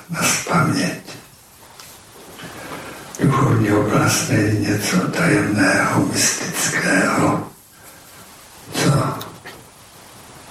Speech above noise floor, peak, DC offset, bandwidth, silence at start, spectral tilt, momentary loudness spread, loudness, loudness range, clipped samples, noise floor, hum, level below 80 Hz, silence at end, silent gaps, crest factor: 28 dB; -4 dBFS; under 0.1%; 16 kHz; 0 s; -4.5 dB/octave; 21 LU; -17 LUFS; 6 LU; under 0.1%; -45 dBFS; none; -48 dBFS; 0 s; none; 16 dB